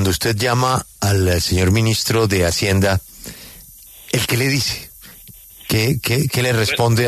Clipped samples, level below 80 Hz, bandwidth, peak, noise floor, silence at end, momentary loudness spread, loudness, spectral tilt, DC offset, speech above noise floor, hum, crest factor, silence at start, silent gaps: under 0.1%; -38 dBFS; 14 kHz; -4 dBFS; -41 dBFS; 0 s; 18 LU; -17 LUFS; -4.5 dB/octave; under 0.1%; 25 dB; none; 14 dB; 0 s; none